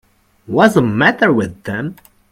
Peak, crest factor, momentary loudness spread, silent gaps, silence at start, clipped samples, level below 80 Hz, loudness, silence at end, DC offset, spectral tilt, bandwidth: 0 dBFS; 16 dB; 12 LU; none; 0.5 s; under 0.1%; -50 dBFS; -14 LUFS; 0.4 s; under 0.1%; -6.5 dB/octave; 15.5 kHz